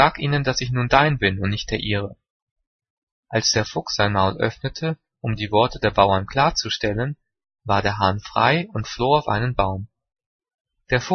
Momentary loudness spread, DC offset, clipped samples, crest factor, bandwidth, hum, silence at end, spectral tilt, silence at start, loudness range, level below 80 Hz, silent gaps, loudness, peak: 10 LU; under 0.1%; under 0.1%; 22 dB; 6.6 kHz; none; 0 s; -4.5 dB/octave; 0 s; 3 LU; -42 dBFS; 2.30-2.56 s, 2.67-2.79 s, 2.90-3.23 s, 10.26-10.39 s, 10.54-10.65 s; -21 LUFS; 0 dBFS